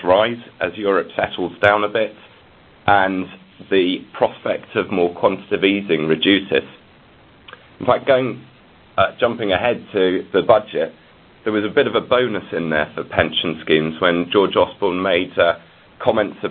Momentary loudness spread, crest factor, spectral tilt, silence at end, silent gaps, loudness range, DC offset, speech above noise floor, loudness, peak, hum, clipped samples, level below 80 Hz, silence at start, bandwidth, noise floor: 9 LU; 18 dB; -8 dB/octave; 0 s; none; 2 LU; under 0.1%; 30 dB; -18 LUFS; 0 dBFS; none; under 0.1%; -50 dBFS; 0 s; 4.7 kHz; -48 dBFS